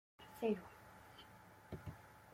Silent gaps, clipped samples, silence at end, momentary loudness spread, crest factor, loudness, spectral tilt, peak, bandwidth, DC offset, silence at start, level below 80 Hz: none; under 0.1%; 0 s; 19 LU; 22 dB; -46 LUFS; -6.5 dB/octave; -26 dBFS; 16.5 kHz; under 0.1%; 0.2 s; -70 dBFS